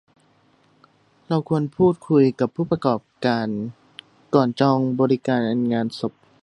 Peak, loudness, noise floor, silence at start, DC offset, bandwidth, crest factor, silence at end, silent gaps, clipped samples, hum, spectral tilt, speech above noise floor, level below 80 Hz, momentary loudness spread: -2 dBFS; -21 LUFS; -59 dBFS; 1.3 s; under 0.1%; 10.5 kHz; 20 dB; 0.3 s; none; under 0.1%; none; -8 dB/octave; 39 dB; -60 dBFS; 9 LU